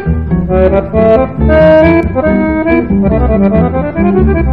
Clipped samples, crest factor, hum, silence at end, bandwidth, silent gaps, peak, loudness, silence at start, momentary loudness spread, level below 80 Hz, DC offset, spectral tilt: 0.9%; 8 dB; none; 0 s; 5.2 kHz; none; 0 dBFS; -9 LUFS; 0 s; 6 LU; -18 dBFS; 2%; -10.5 dB/octave